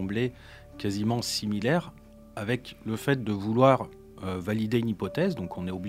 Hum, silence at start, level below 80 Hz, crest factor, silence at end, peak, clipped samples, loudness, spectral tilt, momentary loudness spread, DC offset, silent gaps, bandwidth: none; 0 s; -56 dBFS; 22 dB; 0 s; -6 dBFS; under 0.1%; -28 LUFS; -6 dB/octave; 14 LU; under 0.1%; none; 16 kHz